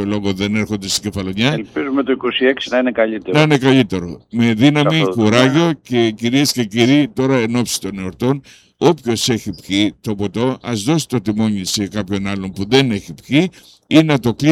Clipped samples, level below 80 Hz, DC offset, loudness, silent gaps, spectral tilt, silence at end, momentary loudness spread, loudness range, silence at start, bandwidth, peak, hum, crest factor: under 0.1%; -50 dBFS; under 0.1%; -16 LUFS; none; -5 dB/octave; 0 s; 9 LU; 4 LU; 0 s; 16 kHz; 0 dBFS; none; 16 dB